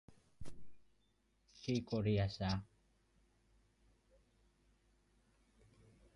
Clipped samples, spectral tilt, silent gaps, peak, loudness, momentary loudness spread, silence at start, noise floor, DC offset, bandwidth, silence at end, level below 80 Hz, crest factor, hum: under 0.1%; -7 dB/octave; none; -26 dBFS; -40 LUFS; 22 LU; 0.1 s; -78 dBFS; under 0.1%; 11 kHz; 3.5 s; -62 dBFS; 20 dB; none